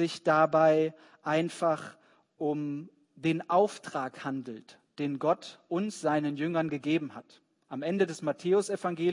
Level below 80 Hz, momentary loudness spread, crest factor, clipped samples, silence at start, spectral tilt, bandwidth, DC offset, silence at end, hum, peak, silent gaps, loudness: -80 dBFS; 14 LU; 20 dB; under 0.1%; 0 s; -6 dB/octave; 11 kHz; under 0.1%; 0 s; none; -10 dBFS; none; -30 LUFS